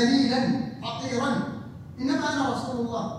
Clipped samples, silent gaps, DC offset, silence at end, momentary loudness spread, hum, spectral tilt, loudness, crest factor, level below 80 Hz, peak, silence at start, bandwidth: under 0.1%; none; under 0.1%; 0 s; 11 LU; none; -5 dB/octave; -27 LUFS; 16 dB; -60 dBFS; -10 dBFS; 0 s; 11 kHz